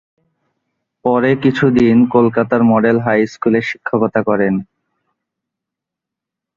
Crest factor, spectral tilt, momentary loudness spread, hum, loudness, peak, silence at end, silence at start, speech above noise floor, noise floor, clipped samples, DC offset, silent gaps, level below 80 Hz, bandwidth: 16 dB; -8 dB/octave; 6 LU; none; -14 LUFS; 0 dBFS; 1.95 s; 1.05 s; 70 dB; -83 dBFS; under 0.1%; under 0.1%; none; -50 dBFS; 7.2 kHz